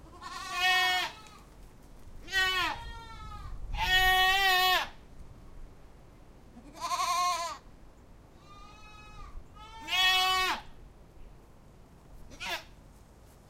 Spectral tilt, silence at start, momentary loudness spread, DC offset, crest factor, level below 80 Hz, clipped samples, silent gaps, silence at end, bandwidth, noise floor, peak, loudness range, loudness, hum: -1 dB/octave; 0.05 s; 26 LU; under 0.1%; 20 dB; -48 dBFS; under 0.1%; none; 0.5 s; 16 kHz; -55 dBFS; -14 dBFS; 9 LU; -27 LUFS; none